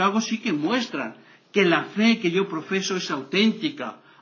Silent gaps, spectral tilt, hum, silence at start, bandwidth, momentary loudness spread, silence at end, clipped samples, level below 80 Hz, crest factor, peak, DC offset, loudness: none; -4.5 dB/octave; none; 0 s; 7.2 kHz; 10 LU; 0.25 s; under 0.1%; -78 dBFS; 18 dB; -6 dBFS; under 0.1%; -23 LUFS